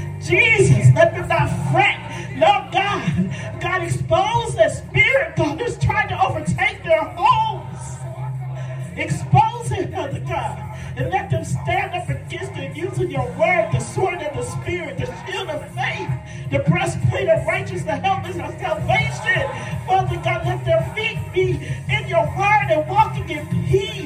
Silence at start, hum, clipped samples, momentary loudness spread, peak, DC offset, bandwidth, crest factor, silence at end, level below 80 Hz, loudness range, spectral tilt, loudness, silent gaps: 0 s; none; under 0.1%; 12 LU; 0 dBFS; under 0.1%; 13 kHz; 20 dB; 0 s; -42 dBFS; 5 LU; -5.5 dB/octave; -20 LUFS; none